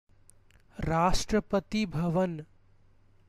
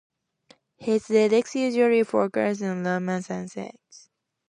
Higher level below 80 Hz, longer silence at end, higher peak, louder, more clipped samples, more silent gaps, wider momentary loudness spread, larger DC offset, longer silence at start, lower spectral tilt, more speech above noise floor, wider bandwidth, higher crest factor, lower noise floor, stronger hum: first, -42 dBFS vs -72 dBFS; about the same, 0.85 s vs 0.8 s; second, -14 dBFS vs -8 dBFS; second, -29 LUFS vs -24 LUFS; neither; neither; about the same, 12 LU vs 14 LU; neither; about the same, 0.8 s vs 0.8 s; about the same, -5.5 dB/octave vs -6 dB/octave; second, 32 dB vs 36 dB; first, 15 kHz vs 10.5 kHz; about the same, 18 dB vs 18 dB; about the same, -60 dBFS vs -60 dBFS; neither